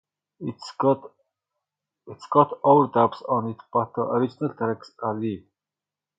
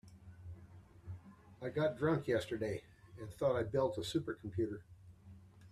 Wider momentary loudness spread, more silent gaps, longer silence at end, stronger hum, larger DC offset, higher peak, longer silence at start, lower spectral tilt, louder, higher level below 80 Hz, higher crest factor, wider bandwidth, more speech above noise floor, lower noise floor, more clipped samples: second, 16 LU vs 24 LU; neither; first, 0.8 s vs 0 s; first, 50 Hz at -55 dBFS vs none; neither; first, -4 dBFS vs -22 dBFS; first, 0.4 s vs 0.05 s; first, -8.5 dB/octave vs -6.5 dB/octave; first, -24 LUFS vs -38 LUFS; about the same, -68 dBFS vs -66 dBFS; about the same, 22 dB vs 18 dB; second, 9 kHz vs 14 kHz; first, 66 dB vs 21 dB; first, -89 dBFS vs -58 dBFS; neither